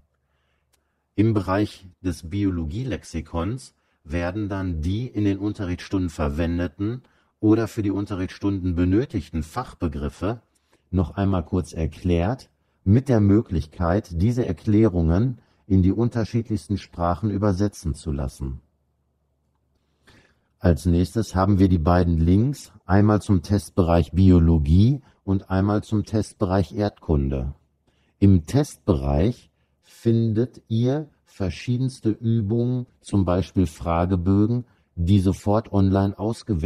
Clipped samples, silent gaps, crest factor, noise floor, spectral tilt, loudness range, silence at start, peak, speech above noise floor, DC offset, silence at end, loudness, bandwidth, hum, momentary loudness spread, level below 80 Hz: under 0.1%; none; 18 dB; -69 dBFS; -8 dB/octave; 7 LU; 1.15 s; -4 dBFS; 48 dB; under 0.1%; 0 s; -23 LUFS; 12 kHz; none; 11 LU; -38 dBFS